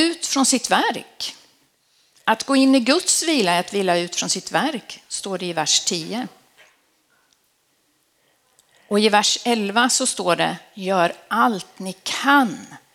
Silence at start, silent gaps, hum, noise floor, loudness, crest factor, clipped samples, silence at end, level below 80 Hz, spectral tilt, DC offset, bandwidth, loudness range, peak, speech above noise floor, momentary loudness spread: 0 s; none; none; -65 dBFS; -19 LUFS; 20 dB; under 0.1%; 0.15 s; -70 dBFS; -2.5 dB/octave; under 0.1%; 16 kHz; 6 LU; 0 dBFS; 45 dB; 13 LU